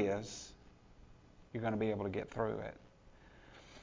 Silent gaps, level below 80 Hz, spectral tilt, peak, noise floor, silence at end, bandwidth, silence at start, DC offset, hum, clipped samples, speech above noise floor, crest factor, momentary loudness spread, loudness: none; -62 dBFS; -6 dB/octave; -22 dBFS; -61 dBFS; 0 s; 7.6 kHz; 0 s; under 0.1%; none; under 0.1%; 22 dB; 20 dB; 23 LU; -40 LUFS